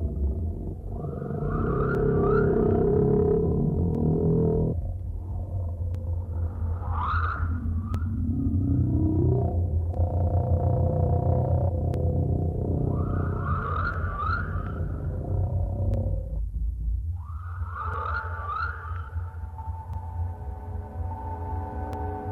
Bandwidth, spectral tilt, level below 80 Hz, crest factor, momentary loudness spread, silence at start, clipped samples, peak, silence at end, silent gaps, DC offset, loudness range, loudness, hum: 4.4 kHz; -11 dB/octave; -34 dBFS; 14 dB; 12 LU; 0 s; under 0.1%; -12 dBFS; 0 s; none; 0.1%; 9 LU; -28 LUFS; none